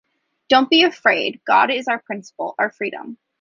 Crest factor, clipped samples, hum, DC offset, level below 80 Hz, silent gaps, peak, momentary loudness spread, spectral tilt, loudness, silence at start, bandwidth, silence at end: 18 dB; under 0.1%; none; under 0.1%; -68 dBFS; none; -2 dBFS; 15 LU; -3.5 dB/octave; -18 LUFS; 0.5 s; 7.4 kHz; 0.25 s